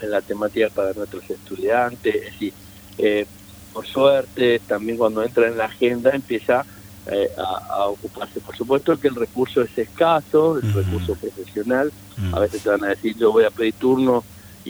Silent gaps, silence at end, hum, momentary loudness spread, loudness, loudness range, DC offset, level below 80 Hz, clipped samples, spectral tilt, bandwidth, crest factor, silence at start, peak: none; 0 s; 50 Hz at -50 dBFS; 13 LU; -21 LUFS; 3 LU; under 0.1%; -48 dBFS; under 0.1%; -6.5 dB/octave; over 20 kHz; 18 dB; 0 s; -2 dBFS